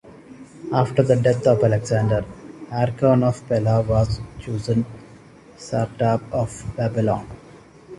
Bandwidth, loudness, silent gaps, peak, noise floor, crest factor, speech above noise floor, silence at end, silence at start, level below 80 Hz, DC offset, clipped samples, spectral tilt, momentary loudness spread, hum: 11.5 kHz; -21 LUFS; none; -4 dBFS; -46 dBFS; 18 dB; 26 dB; 0.05 s; 0.05 s; -42 dBFS; under 0.1%; under 0.1%; -7.5 dB/octave; 13 LU; none